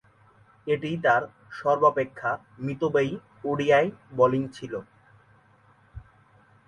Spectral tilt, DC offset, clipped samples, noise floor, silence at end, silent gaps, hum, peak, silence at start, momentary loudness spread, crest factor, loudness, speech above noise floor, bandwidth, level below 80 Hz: -7 dB/octave; under 0.1%; under 0.1%; -59 dBFS; 0.65 s; none; none; -6 dBFS; 0.65 s; 14 LU; 20 dB; -25 LUFS; 34 dB; 10.5 kHz; -60 dBFS